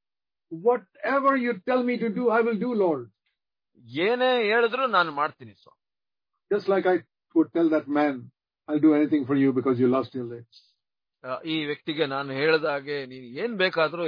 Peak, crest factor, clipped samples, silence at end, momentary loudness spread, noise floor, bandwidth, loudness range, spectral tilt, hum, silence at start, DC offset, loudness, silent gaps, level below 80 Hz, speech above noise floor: -8 dBFS; 18 dB; under 0.1%; 0 s; 11 LU; under -90 dBFS; 5.2 kHz; 4 LU; -8 dB/octave; none; 0.5 s; under 0.1%; -25 LUFS; none; -76 dBFS; over 66 dB